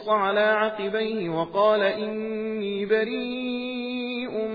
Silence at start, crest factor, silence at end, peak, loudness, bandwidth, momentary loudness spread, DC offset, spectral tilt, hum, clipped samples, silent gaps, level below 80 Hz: 0 s; 16 dB; 0 s; -10 dBFS; -25 LUFS; 5 kHz; 8 LU; under 0.1%; -7.5 dB/octave; none; under 0.1%; none; -64 dBFS